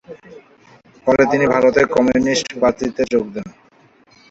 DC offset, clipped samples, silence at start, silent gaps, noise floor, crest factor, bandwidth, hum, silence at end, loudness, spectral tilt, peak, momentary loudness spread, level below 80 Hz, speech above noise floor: under 0.1%; under 0.1%; 0.1 s; none; -52 dBFS; 16 dB; 8 kHz; none; 0.8 s; -16 LUFS; -5 dB/octave; -2 dBFS; 11 LU; -48 dBFS; 36 dB